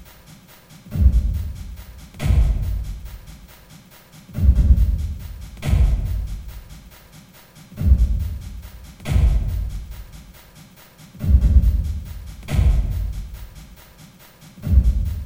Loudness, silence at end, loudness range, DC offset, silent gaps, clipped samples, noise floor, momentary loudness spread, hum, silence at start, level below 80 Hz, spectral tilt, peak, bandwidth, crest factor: -21 LUFS; 0 s; 4 LU; under 0.1%; none; under 0.1%; -46 dBFS; 23 LU; none; 0 s; -22 dBFS; -7.5 dB/octave; -2 dBFS; 16.5 kHz; 18 dB